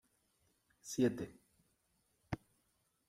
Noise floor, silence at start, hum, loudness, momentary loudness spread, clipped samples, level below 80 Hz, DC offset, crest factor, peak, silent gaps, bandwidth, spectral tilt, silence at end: -80 dBFS; 0.85 s; none; -40 LUFS; 14 LU; under 0.1%; -70 dBFS; under 0.1%; 22 dB; -22 dBFS; none; 16 kHz; -5.5 dB/octave; 0.75 s